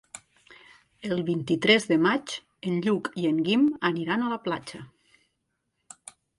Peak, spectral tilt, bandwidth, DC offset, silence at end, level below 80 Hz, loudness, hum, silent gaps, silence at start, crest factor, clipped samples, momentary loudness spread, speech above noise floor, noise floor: -6 dBFS; -5 dB/octave; 11.5 kHz; under 0.1%; 1.5 s; -68 dBFS; -25 LUFS; none; none; 0.15 s; 22 dB; under 0.1%; 24 LU; 53 dB; -78 dBFS